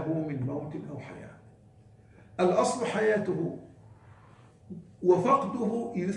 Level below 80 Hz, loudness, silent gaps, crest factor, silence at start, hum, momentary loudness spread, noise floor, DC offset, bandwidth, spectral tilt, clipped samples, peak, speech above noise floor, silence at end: -66 dBFS; -28 LUFS; none; 20 dB; 0 s; none; 21 LU; -56 dBFS; under 0.1%; 11.5 kHz; -6.5 dB/octave; under 0.1%; -10 dBFS; 28 dB; 0 s